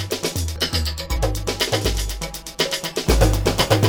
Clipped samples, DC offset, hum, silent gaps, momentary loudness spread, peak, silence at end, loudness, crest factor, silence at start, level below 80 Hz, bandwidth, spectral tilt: under 0.1%; under 0.1%; none; none; 7 LU; -6 dBFS; 0 s; -22 LUFS; 16 dB; 0 s; -26 dBFS; over 20 kHz; -4 dB/octave